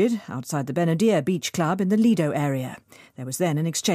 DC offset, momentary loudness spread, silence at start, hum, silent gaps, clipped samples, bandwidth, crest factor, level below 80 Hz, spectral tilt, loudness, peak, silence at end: under 0.1%; 11 LU; 0 s; none; none; under 0.1%; 15.5 kHz; 14 dB; -68 dBFS; -5.5 dB/octave; -23 LUFS; -10 dBFS; 0 s